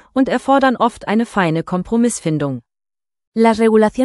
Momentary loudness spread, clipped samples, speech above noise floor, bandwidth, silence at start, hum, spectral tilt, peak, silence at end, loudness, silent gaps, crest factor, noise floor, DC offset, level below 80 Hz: 8 LU; under 0.1%; over 75 dB; 12 kHz; 0.15 s; none; -6 dB/octave; -2 dBFS; 0 s; -16 LUFS; 3.27-3.32 s; 14 dB; under -90 dBFS; under 0.1%; -48 dBFS